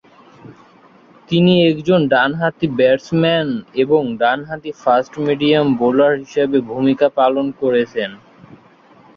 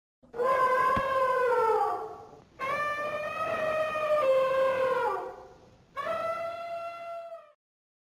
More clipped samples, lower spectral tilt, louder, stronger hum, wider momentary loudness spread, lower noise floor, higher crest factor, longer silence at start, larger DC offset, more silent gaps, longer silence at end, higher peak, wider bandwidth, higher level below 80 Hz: neither; first, -7 dB/octave vs -4.5 dB/octave; first, -16 LUFS vs -28 LUFS; neither; second, 7 LU vs 17 LU; second, -47 dBFS vs -55 dBFS; about the same, 14 dB vs 14 dB; about the same, 0.45 s vs 0.35 s; neither; neither; second, 0.6 s vs 0.75 s; first, -2 dBFS vs -16 dBFS; second, 7 kHz vs 16 kHz; first, -56 dBFS vs -62 dBFS